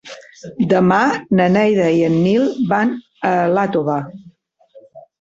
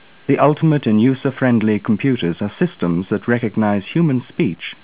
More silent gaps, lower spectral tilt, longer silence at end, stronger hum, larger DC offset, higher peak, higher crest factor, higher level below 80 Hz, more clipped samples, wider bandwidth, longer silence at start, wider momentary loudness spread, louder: neither; second, -7.5 dB/octave vs -12 dB/octave; about the same, 0.2 s vs 0.1 s; neither; second, under 0.1% vs 0.4%; about the same, -2 dBFS vs 0 dBFS; about the same, 14 dB vs 16 dB; about the same, -56 dBFS vs -52 dBFS; neither; first, 7.8 kHz vs 4 kHz; second, 0.05 s vs 0.3 s; first, 10 LU vs 6 LU; about the same, -16 LUFS vs -17 LUFS